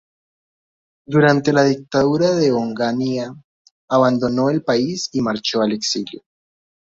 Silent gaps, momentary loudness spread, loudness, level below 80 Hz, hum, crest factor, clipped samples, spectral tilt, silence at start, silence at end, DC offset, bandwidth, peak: 3.44-3.65 s, 3.71-3.88 s; 7 LU; -18 LUFS; -56 dBFS; none; 18 dB; under 0.1%; -5.5 dB/octave; 1.1 s; 0.7 s; under 0.1%; 7.8 kHz; -2 dBFS